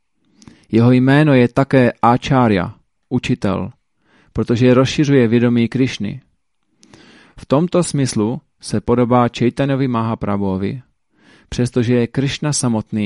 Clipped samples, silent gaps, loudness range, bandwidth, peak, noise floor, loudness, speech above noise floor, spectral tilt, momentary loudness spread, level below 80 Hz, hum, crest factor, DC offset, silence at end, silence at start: under 0.1%; none; 5 LU; 11.5 kHz; 0 dBFS; -67 dBFS; -16 LUFS; 52 dB; -6.5 dB/octave; 12 LU; -44 dBFS; none; 16 dB; under 0.1%; 0 s; 0.7 s